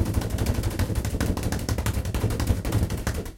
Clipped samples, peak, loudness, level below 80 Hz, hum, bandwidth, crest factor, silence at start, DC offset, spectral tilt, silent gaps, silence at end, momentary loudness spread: under 0.1%; -8 dBFS; -27 LUFS; -30 dBFS; none; 17 kHz; 16 dB; 0 s; under 0.1%; -5.5 dB/octave; none; 0 s; 2 LU